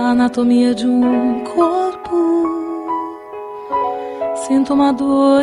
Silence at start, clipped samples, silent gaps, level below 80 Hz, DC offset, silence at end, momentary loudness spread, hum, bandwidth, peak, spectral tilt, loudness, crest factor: 0 s; under 0.1%; none; -52 dBFS; under 0.1%; 0 s; 9 LU; none; 11.5 kHz; -2 dBFS; -5.5 dB/octave; -16 LUFS; 12 dB